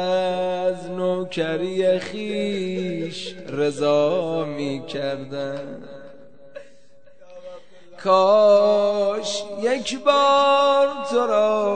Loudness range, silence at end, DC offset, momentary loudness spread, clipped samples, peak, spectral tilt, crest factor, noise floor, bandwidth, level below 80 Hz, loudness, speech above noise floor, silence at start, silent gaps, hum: 12 LU; 0 s; 0.7%; 14 LU; under 0.1%; -4 dBFS; -5 dB/octave; 18 dB; -55 dBFS; 9.4 kHz; -70 dBFS; -21 LUFS; 34 dB; 0 s; none; none